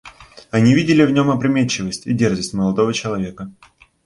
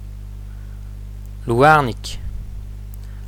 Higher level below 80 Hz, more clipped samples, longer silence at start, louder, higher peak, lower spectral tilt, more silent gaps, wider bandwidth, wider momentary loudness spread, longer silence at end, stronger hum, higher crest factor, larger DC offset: second, -48 dBFS vs -32 dBFS; neither; about the same, 0.05 s vs 0 s; about the same, -17 LUFS vs -16 LUFS; about the same, -2 dBFS vs 0 dBFS; about the same, -6 dB/octave vs -6 dB/octave; neither; second, 11.5 kHz vs 18.5 kHz; second, 11 LU vs 23 LU; first, 0.55 s vs 0 s; second, none vs 50 Hz at -30 dBFS; about the same, 16 dB vs 20 dB; neither